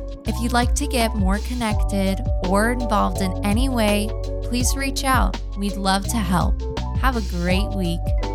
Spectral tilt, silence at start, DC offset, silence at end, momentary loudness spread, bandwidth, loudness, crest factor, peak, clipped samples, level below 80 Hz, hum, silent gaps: -5 dB/octave; 0 s; under 0.1%; 0 s; 6 LU; 16 kHz; -22 LUFS; 16 dB; -4 dBFS; under 0.1%; -24 dBFS; none; none